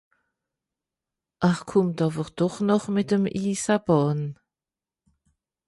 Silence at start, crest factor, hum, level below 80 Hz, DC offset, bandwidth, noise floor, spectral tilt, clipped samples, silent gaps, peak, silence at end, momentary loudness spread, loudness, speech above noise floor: 1.4 s; 18 dB; none; -60 dBFS; under 0.1%; 11.5 kHz; under -90 dBFS; -6.5 dB/octave; under 0.1%; none; -8 dBFS; 1.35 s; 5 LU; -24 LUFS; over 67 dB